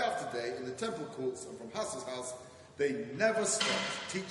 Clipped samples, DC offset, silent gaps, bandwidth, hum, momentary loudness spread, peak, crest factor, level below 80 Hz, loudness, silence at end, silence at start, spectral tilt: under 0.1%; under 0.1%; none; 11.5 kHz; none; 12 LU; -16 dBFS; 20 dB; -74 dBFS; -35 LUFS; 0 s; 0 s; -2.5 dB/octave